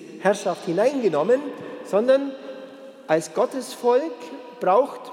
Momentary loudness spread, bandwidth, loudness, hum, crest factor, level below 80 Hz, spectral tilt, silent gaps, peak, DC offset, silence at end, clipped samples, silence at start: 17 LU; 14.5 kHz; -22 LUFS; none; 18 dB; -86 dBFS; -5 dB/octave; none; -4 dBFS; under 0.1%; 0 s; under 0.1%; 0 s